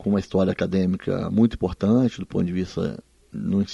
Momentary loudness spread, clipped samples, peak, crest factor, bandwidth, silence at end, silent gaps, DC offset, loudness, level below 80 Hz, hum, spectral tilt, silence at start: 9 LU; under 0.1%; -6 dBFS; 16 dB; 7.6 kHz; 0 s; none; under 0.1%; -23 LUFS; -46 dBFS; none; -8 dB/octave; 0 s